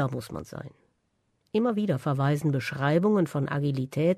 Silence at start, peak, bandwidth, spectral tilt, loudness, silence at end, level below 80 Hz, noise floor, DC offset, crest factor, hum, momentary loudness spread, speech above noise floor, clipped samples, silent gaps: 0 s; -12 dBFS; 13.5 kHz; -7.5 dB/octave; -27 LUFS; 0 s; -62 dBFS; -73 dBFS; under 0.1%; 14 dB; none; 14 LU; 47 dB; under 0.1%; none